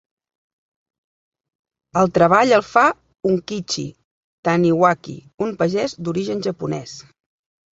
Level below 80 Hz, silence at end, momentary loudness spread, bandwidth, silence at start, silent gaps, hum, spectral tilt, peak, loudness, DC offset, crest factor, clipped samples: -58 dBFS; 0.7 s; 13 LU; 8 kHz; 1.95 s; 4.04-4.43 s; none; -5.5 dB/octave; -2 dBFS; -19 LUFS; under 0.1%; 20 dB; under 0.1%